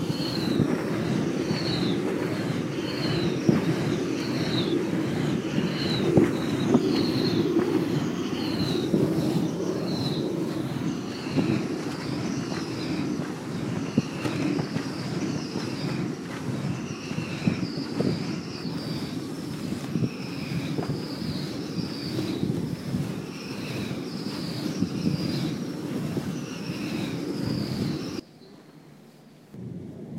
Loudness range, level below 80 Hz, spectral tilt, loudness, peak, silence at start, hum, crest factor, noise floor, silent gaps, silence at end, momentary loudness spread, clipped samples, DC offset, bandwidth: 7 LU; -56 dBFS; -6 dB/octave; -28 LUFS; -6 dBFS; 0 s; none; 22 dB; -51 dBFS; none; 0 s; 8 LU; under 0.1%; under 0.1%; 16 kHz